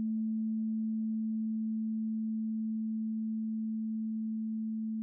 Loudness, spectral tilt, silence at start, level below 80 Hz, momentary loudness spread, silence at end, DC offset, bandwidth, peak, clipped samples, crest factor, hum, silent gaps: -35 LUFS; -16.5 dB/octave; 0 s; under -90 dBFS; 2 LU; 0 s; under 0.1%; 0.7 kHz; -30 dBFS; under 0.1%; 4 dB; none; none